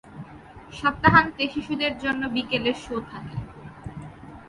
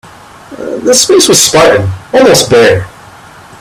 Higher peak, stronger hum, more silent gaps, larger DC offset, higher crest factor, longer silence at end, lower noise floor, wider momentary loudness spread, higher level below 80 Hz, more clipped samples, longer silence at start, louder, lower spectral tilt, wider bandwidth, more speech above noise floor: about the same, -2 dBFS vs 0 dBFS; neither; neither; neither; first, 24 dB vs 8 dB; second, 0 s vs 0.7 s; first, -45 dBFS vs -33 dBFS; first, 24 LU vs 13 LU; second, -48 dBFS vs -40 dBFS; second, under 0.1% vs 0.6%; second, 0.05 s vs 0.5 s; second, -23 LUFS vs -6 LUFS; first, -6 dB/octave vs -3 dB/octave; second, 11.5 kHz vs over 20 kHz; second, 21 dB vs 26 dB